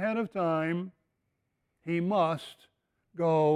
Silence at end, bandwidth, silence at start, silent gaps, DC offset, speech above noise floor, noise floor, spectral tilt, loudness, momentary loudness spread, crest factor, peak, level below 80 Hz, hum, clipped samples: 0 s; 12.5 kHz; 0 s; none; under 0.1%; 51 dB; -80 dBFS; -8 dB/octave; -30 LUFS; 18 LU; 16 dB; -14 dBFS; -74 dBFS; none; under 0.1%